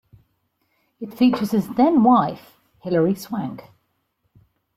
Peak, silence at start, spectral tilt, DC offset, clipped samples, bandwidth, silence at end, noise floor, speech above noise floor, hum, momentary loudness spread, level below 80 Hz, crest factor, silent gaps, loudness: -4 dBFS; 1 s; -7.5 dB/octave; under 0.1%; under 0.1%; 16 kHz; 1.15 s; -71 dBFS; 52 dB; none; 21 LU; -62 dBFS; 18 dB; none; -19 LUFS